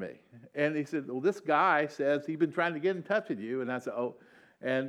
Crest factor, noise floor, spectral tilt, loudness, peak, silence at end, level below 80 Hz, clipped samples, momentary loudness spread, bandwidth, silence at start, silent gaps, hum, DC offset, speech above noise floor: 18 dB; -50 dBFS; -6.5 dB/octave; -31 LUFS; -12 dBFS; 0 s; -86 dBFS; under 0.1%; 10 LU; 12 kHz; 0 s; none; none; under 0.1%; 20 dB